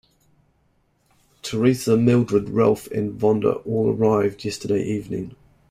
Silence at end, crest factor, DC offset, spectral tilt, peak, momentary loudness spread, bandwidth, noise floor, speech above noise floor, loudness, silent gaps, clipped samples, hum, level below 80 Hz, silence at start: 0.35 s; 18 dB; under 0.1%; -7 dB/octave; -4 dBFS; 12 LU; 16 kHz; -64 dBFS; 44 dB; -21 LUFS; none; under 0.1%; none; -54 dBFS; 1.45 s